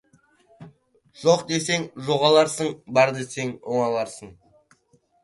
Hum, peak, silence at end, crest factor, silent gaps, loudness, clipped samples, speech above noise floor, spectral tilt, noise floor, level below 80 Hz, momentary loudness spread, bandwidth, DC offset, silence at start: none; -4 dBFS; 0.9 s; 20 dB; none; -22 LUFS; under 0.1%; 41 dB; -4 dB/octave; -63 dBFS; -66 dBFS; 12 LU; 11.5 kHz; under 0.1%; 0.6 s